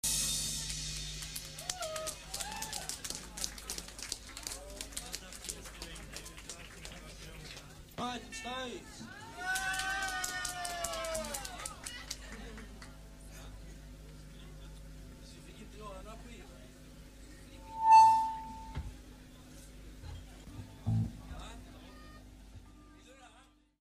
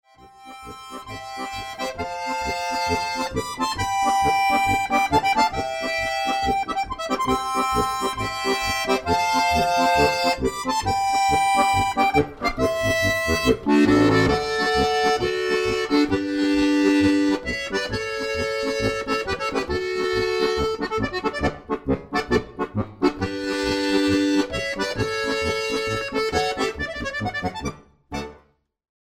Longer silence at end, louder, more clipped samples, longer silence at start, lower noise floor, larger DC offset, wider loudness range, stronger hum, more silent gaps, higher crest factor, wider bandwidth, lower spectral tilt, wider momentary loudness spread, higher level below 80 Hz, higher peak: second, 0.35 s vs 0.8 s; second, -35 LUFS vs -22 LUFS; neither; second, 0.05 s vs 0.2 s; first, -63 dBFS vs -58 dBFS; neither; first, 21 LU vs 5 LU; neither; neither; first, 24 dB vs 18 dB; second, 15.5 kHz vs 18 kHz; second, -2.5 dB/octave vs -4.5 dB/octave; first, 19 LU vs 10 LU; second, -52 dBFS vs -42 dBFS; second, -12 dBFS vs -4 dBFS